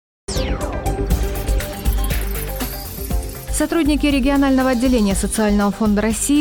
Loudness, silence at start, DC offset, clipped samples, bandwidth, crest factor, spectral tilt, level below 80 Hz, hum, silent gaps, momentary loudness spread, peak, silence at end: -19 LUFS; 0.3 s; under 0.1%; under 0.1%; 18 kHz; 12 dB; -5 dB/octave; -24 dBFS; none; none; 9 LU; -6 dBFS; 0 s